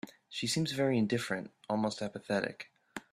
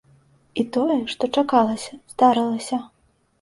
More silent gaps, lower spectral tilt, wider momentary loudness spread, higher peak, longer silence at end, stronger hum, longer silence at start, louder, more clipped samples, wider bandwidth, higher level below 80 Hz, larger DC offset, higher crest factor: neither; about the same, -4.5 dB/octave vs -4.5 dB/octave; about the same, 13 LU vs 12 LU; second, -16 dBFS vs -4 dBFS; second, 0.15 s vs 0.55 s; neither; second, 0.05 s vs 0.55 s; second, -34 LUFS vs -21 LUFS; neither; first, 14.5 kHz vs 11.5 kHz; second, -72 dBFS vs -62 dBFS; neither; about the same, 18 dB vs 18 dB